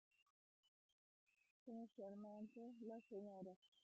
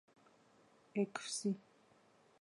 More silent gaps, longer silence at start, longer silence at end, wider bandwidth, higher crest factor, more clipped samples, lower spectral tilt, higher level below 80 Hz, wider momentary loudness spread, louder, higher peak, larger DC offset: first, 0.22-1.27 s, 1.51-1.66 s, 3.56-3.62 s, 3.68-3.72 s vs none; second, 0.2 s vs 0.95 s; second, 0.05 s vs 0.8 s; second, 7.4 kHz vs 11.5 kHz; second, 14 dB vs 20 dB; neither; first, -7.5 dB/octave vs -4.5 dB/octave; about the same, under -90 dBFS vs under -90 dBFS; about the same, 4 LU vs 5 LU; second, -58 LUFS vs -41 LUFS; second, -44 dBFS vs -26 dBFS; neither